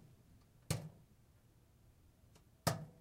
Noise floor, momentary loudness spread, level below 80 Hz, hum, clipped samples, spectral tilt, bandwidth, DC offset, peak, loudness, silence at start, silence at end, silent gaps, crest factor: -68 dBFS; 27 LU; -68 dBFS; none; under 0.1%; -4.5 dB/octave; 16 kHz; under 0.1%; -20 dBFS; -43 LUFS; 0.35 s; 0.05 s; none; 28 dB